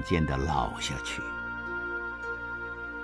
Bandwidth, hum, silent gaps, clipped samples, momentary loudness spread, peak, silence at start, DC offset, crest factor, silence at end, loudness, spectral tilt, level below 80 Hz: 11 kHz; none; none; under 0.1%; 7 LU; -12 dBFS; 0 s; under 0.1%; 20 dB; 0 s; -32 LUFS; -5 dB/octave; -42 dBFS